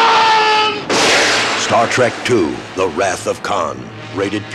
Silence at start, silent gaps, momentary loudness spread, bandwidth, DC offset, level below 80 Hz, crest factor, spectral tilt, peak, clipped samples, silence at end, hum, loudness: 0 s; none; 10 LU; 14 kHz; under 0.1%; -50 dBFS; 14 dB; -2.5 dB/octave; -2 dBFS; under 0.1%; 0 s; none; -14 LUFS